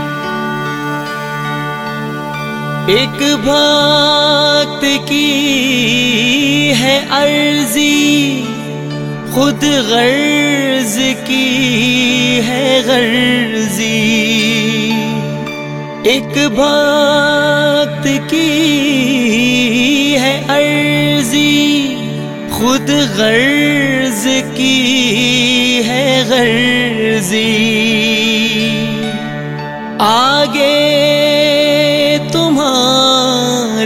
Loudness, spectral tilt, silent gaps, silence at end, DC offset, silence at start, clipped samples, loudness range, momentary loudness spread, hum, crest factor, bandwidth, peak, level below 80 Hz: -11 LUFS; -3.5 dB/octave; none; 0 s; 0.4%; 0 s; under 0.1%; 3 LU; 9 LU; none; 12 dB; 17 kHz; 0 dBFS; -46 dBFS